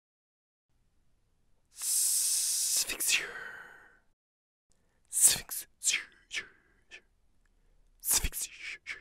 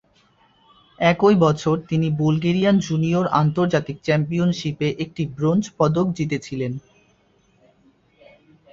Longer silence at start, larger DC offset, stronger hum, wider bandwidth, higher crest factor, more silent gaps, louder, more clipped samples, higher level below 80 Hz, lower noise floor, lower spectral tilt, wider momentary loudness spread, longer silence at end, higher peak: first, 1.75 s vs 1 s; neither; neither; first, 16 kHz vs 7.6 kHz; first, 28 dB vs 18 dB; first, 4.13-4.70 s vs none; second, -28 LUFS vs -20 LUFS; neither; about the same, -52 dBFS vs -54 dBFS; first, -69 dBFS vs -60 dBFS; second, 1.5 dB/octave vs -7 dB/octave; first, 17 LU vs 9 LU; second, 0 s vs 1.95 s; second, -6 dBFS vs -2 dBFS